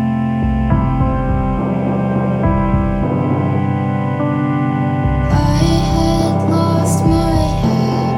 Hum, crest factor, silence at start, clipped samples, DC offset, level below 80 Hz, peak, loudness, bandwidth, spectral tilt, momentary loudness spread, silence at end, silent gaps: none; 14 dB; 0 s; under 0.1%; under 0.1%; -24 dBFS; -2 dBFS; -16 LUFS; 13 kHz; -7.5 dB/octave; 4 LU; 0 s; none